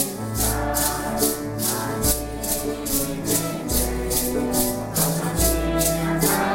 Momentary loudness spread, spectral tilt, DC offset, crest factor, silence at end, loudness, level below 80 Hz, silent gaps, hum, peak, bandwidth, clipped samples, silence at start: 4 LU; -3.5 dB/octave; under 0.1%; 18 dB; 0 s; -22 LUFS; -32 dBFS; none; none; -6 dBFS; 16.5 kHz; under 0.1%; 0 s